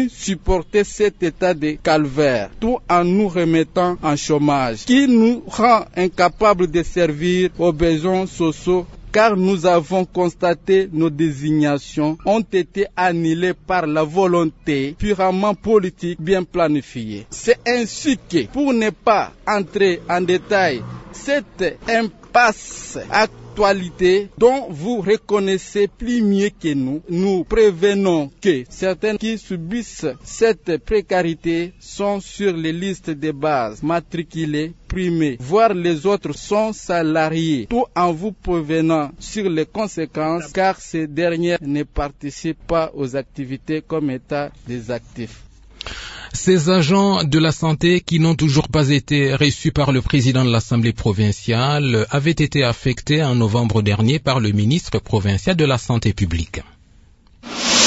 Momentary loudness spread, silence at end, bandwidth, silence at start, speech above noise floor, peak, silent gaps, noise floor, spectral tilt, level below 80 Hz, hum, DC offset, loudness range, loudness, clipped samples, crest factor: 9 LU; 0 s; 8 kHz; 0 s; 32 dB; -2 dBFS; none; -49 dBFS; -5.5 dB/octave; -40 dBFS; none; under 0.1%; 5 LU; -18 LUFS; under 0.1%; 16 dB